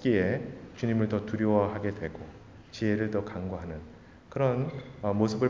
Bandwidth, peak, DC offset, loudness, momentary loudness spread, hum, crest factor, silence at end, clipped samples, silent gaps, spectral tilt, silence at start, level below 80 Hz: 7.6 kHz; -10 dBFS; under 0.1%; -30 LUFS; 17 LU; none; 20 dB; 0 s; under 0.1%; none; -8 dB/octave; 0 s; -52 dBFS